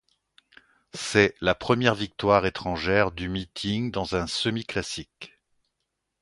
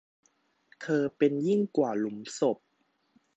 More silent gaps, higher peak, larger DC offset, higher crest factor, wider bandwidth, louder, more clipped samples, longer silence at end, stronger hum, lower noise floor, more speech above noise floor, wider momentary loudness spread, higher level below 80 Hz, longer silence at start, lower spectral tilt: neither; first, -4 dBFS vs -12 dBFS; neither; first, 24 dB vs 18 dB; first, 11.5 kHz vs 8.6 kHz; first, -25 LUFS vs -29 LUFS; neither; first, 0.95 s vs 0.8 s; neither; first, -81 dBFS vs -73 dBFS; first, 55 dB vs 45 dB; first, 13 LU vs 9 LU; first, -48 dBFS vs -80 dBFS; first, 0.95 s vs 0.8 s; second, -5 dB/octave vs -6.5 dB/octave